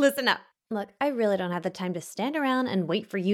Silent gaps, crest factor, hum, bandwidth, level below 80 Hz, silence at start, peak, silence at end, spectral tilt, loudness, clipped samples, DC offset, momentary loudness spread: none; 18 dB; none; 18.5 kHz; -78 dBFS; 0 s; -8 dBFS; 0 s; -5 dB/octave; -28 LUFS; under 0.1%; under 0.1%; 8 LU